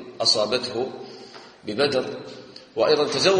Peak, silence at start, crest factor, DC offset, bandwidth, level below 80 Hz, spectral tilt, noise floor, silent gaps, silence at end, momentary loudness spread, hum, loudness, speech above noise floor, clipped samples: -6 dBFS; 0 s; 18 dB; under 0.1%; 10 kHz; -64 dBFS; -3 dB/octave; -44 dBFS; none; 0 s; 21 LU; none; -22 LUFS; 22 dB; under 0.1%